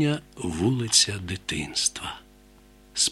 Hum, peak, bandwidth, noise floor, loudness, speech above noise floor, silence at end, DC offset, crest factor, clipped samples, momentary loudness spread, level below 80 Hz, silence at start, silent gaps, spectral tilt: none; -4 dBFS; 15.5 kHz; -53 dBFS; -24 LUFS; 27 dB; 0 s; under 0.1%; 22 dB; under 0.1%; 16 LU; -50 dBFS; 0 s; none; -2.5 dB/octave